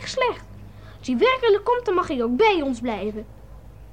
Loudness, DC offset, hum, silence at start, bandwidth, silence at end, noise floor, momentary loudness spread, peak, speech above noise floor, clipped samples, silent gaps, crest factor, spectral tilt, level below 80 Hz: -22 LUFS; 0.3%; none; 0 s; 9.8 kHz; 0 s; -43 dBFS; 13 LU; -8 dBFS; 21 dB; under 0.1%; none; 16 dB; -5 dB/octave; -46 dBFS